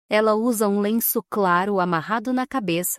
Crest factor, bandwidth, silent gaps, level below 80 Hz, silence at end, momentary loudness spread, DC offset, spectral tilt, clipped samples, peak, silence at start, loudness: 14 dB; 16 kHz; none; -66 dBFS; 0 s; 4 LU; under 0.1%; -4.5 dB/octave; under 0.1%; -6 dBFS; 0.1 s; -21 LUFS